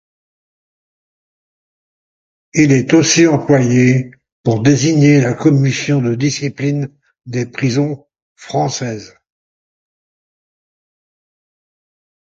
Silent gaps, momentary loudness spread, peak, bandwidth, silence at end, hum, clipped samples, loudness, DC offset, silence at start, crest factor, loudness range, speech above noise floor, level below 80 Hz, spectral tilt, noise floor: 4.32-4.44 s, 8.22-8.36 s; 12 LU; 0 dBFS; 7.8 kHz; 3.3 s; none; under 0.1%; -14 LUFS; under 0.1%; 2.55 s; 16 dB; 14 LU; over 77 dB; -52 dBFS; -5.5 dB/octave; under -90 dBFS